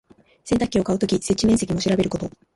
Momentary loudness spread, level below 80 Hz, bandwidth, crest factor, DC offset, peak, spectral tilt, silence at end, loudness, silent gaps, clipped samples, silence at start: 6 LU; -44 dBFS; 11.5 kHz; 14 dB; under 0.1%; -8 dBFS; -5.5 dB/octave; 0.25 s; -21 LUFS; none; under 0.1%; 0.45 s